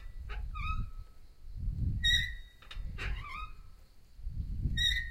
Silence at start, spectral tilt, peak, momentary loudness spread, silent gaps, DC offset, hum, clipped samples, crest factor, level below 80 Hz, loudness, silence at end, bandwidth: 0 s; -3 dB/octave; -16 dBFS; 22 LU; none; under 0.1%; none; under 0.1%; 18 dB; -40 dBFS; -35 LUFS; 0 s; 16 kHz